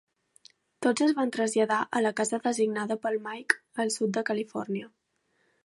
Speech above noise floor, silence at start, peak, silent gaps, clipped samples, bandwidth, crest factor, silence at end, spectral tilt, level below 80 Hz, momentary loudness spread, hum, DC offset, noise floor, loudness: 46 dB; 0.8 s; -4 dBFS; none; under 0.1%; 11.5 kHz; 24 dB; 0.8 s; -4 dB/octave; -82 dBFS; 8 LU; none; under 0.1%; -73 dBFS; -28 LUFS